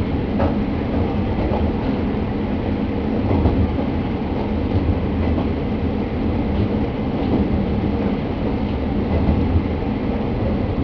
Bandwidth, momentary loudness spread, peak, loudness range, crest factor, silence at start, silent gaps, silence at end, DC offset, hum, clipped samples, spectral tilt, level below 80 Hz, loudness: 5.4 kHz; 4 LU; -4 dBFS; 1 LU; 16 dB; 0 s; none; 0 s; under 0.1%; none; under 0.1%; -10 dB/octave; -26 dBFS; -21 LUFS